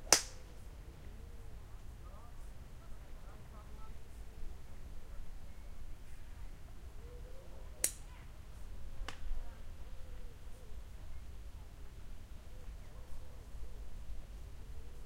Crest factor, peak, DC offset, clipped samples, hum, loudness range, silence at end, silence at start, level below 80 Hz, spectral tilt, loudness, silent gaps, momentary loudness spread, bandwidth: 38 dB; -6 dBFS; under 0.1%; under 0.1%; none; 9 LU; 0 s; 0 s; -48 dBFS; -1.5 dB/octave; -47 LUFS; none; 6 LU; 16 kHz